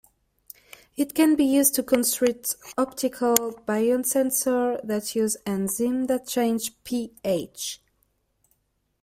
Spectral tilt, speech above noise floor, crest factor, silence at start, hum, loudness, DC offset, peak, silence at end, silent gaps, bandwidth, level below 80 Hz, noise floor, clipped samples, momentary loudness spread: -3.5 dB/octave; 49 dB; 24 dB; 1 s; none; -24 LUFS; under 0.1%; 0 dBFS; 1.25 s; none; 16 kHz; -64 dBFS; -73 dBFS; under 0.1%; 11 LU